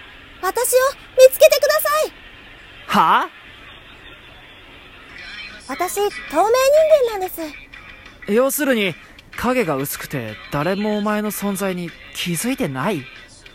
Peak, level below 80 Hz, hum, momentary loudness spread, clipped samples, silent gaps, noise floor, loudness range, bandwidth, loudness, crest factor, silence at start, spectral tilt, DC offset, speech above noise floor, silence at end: 0 dBFS; -50 dBFS; none; 24 LU; under 0.1%; none; -42 dBFS; 7 LU; 16.5 kHz; -18 LUFS; 20 dB; 0 s; -4 dB/octave; under 0.1%; 25 dB; 0.3 s